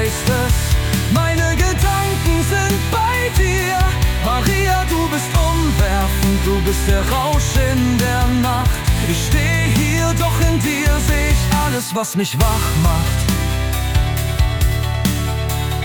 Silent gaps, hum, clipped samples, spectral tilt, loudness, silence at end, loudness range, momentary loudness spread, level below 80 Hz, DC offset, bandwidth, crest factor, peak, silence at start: none; none; under 0.1%; -5 dB/octave; -17 LUFS; 0 s; 1 LU; 3 LU; -20 dBFS; under 0.1%; 19.5 kHz; 12 dB; -4 dBFS; 0 s